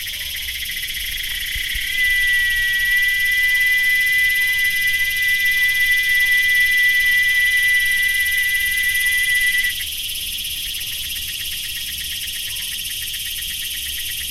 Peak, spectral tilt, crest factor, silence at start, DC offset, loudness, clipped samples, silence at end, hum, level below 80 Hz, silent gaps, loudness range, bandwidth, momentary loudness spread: -6 dBFS; 2 dB/octave; 12 dB; 0 s; under 0.1%; -17 LUFS; under 0.1%; 0 s; none; -40 dBFS; none; 9 LU; 16 kHz; 10 LU